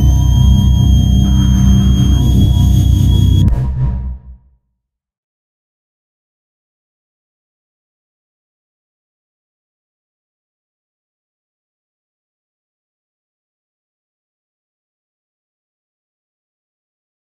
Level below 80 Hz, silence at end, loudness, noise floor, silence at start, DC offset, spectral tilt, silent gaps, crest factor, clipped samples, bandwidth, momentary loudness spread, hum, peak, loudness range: -18 dBFS; 13.05 s; -11 LUFS; -73 dBFS; 0 s; under 0.1%; -7 dB/octave; none; 16 dB; under 0.1%; 14 kHz; 7 LU; none; 0 dBFS; 14 LU